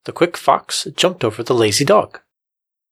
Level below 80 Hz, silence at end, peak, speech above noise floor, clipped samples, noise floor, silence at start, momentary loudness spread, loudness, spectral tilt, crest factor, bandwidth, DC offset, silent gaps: -60 dBFS; 0.75 s; 0 dBFS; 68 dB; under 0.1%; -84 dBFS; 0.05 s; 8 LU; -16 LUFS; -3.5 dB/octave; 18 dB; 15.5 kHz; under 0.1%; none